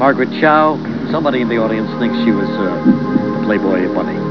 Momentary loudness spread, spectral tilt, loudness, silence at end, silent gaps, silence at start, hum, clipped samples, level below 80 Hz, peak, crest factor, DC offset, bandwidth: 6 LU; -8.5 dB/octave; -15 LUFS; 0 s; none; 0 s; none; under 0.1%; -50 dBFS; 0 dBFS; 14 dB; 0.7%; 5.4 kHz